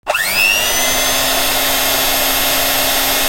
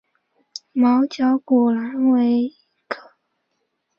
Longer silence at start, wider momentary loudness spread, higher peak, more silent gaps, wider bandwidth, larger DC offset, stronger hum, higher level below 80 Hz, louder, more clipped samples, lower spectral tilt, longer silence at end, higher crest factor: second, 0.05 s vs 0.75 s; second, 2 LU vs 15 LU; first, -2 dBFS vs -6 dBFS; neither; first, 16.5 kHz vs 6.8 kHz; neither; neither; first, -34 dBFS vs -70 dBFS; first, -12 LUFS vs -19 LUFS; neither; second, 0 dB/octave vs -6 dB/octave; second, 0 s vs 1 s; about the same, 14 dB vs 14 dB